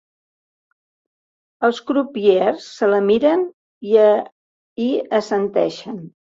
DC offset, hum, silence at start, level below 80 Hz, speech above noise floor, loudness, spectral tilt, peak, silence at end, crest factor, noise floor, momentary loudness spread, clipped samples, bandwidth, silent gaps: under 0.1%; none; 1.6 s; -64 dBFS; over 73 dB; -18 LUFS; -6 dB/octave; -2 dBFS; 0.3 s; 16 dB; under -90 dBFS; 17 LU; under 0.1%; 7.8 kHz; 3.53-3.81 s, 4.32-4.76 s